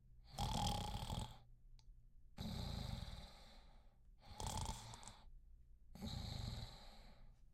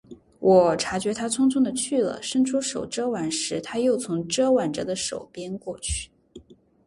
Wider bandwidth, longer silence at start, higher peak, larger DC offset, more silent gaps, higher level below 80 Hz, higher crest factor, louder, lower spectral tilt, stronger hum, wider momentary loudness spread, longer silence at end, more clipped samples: first, 16 kHz vs 11.5 kHz; about the same, 0 s vs 0.1 s; second, -28 dBFS vs -4 dBFS; neither; neither; second, -56 dBFS vs -48 dBFS; about the same, 22 dB vs 20 dB; second, -49 LUFS vs -24 LUFS; about the same, -4.5 dB/octave vs -4 dB/octave; neither; first, 25 LU vs 12 LU; second, 0 s vs 0.35 s; neither